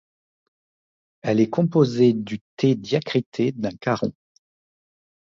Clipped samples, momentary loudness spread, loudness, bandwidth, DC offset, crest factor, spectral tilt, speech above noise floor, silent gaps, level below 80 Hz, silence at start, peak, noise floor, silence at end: under 0.1%; 9 LU; -22 LUFS; 7.6 kHz; under 0.1%; 18 dB; -7.5 dB/octave; over 69 dB; 2.41-2.57 s, 3.26-3.32 s; -62 dBFS; 1.25 s; -4 dBFS; under -90 dBFS; 1.2 s